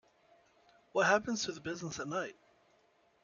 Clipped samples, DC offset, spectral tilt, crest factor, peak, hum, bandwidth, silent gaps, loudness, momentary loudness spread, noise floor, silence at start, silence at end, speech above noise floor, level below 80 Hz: under 0.1%; under 0.1%; -3.5 dB/octave; 24 dB; -14 dBFS; none; 7.4 kHz; none; -35 LUFS; 11 LU; -70 dBFS; 0.95 s; 0.9 s; 36 dB; -74 dBFS